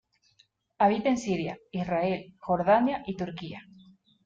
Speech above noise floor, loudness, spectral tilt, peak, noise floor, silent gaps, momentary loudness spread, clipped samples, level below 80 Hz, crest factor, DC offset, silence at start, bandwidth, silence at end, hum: 39 dB; -28 LUFS; -6.5 dB/octave; -12 dBFS; -67 dBFS; none; 12 LU; under 0.1%; -62 dBFS; 18 dB; under 0.1%; 0.8 s; 8.8 kHz; 0.65 s; none